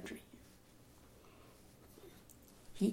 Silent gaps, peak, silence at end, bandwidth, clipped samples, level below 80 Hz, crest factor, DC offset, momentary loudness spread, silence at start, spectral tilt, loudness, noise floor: none; -22 dBFS; 0 s; 16.5 kHz; under 0.1%; -68 dBFS; 24 dB; under 0.1%; 11 LU; 0 s; -6.5 dB/octave; -50 LUFS; -63 dBFS